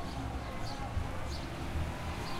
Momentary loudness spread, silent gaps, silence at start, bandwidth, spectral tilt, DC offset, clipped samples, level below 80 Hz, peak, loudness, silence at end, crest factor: 2 LU; none; 0 s; 16 kHz; -5.5 dB/octave; under 0.1%; under 0.1%; -42 dBFS; -24 dBFS; -39 LUFS; 0 s; 14 dB